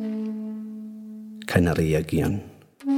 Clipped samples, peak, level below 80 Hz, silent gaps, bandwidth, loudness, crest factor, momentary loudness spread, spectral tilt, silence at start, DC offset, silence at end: under 0.1%; -4 dBFS; -44 dBFS; none; 17.5 kHz; -25 LUFS; 22 dB; 17 LU; -7 dB/octave; 0 s; under 0.1%; 0 s